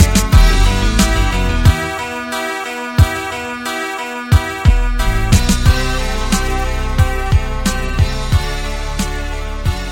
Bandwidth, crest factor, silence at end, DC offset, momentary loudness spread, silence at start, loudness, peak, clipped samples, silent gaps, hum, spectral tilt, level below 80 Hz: 17 kHz; 14 dB; 0 s; under 0.1%; 9 LU; 0 s; -16 LUFS; 0 dBFS; under 0.1%; none; none; -4.5 dB/octave; -16 dBFS